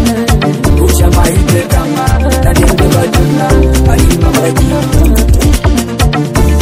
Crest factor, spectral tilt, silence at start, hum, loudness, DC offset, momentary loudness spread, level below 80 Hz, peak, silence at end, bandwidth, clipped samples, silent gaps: 8 dB; -5.5 dB/octave; 0 s; none; -9 LUFS; under 0.1%; 3 LU; -12 dBFS; 0 dBFS; 0 s; 16.5 kHz; 1%; none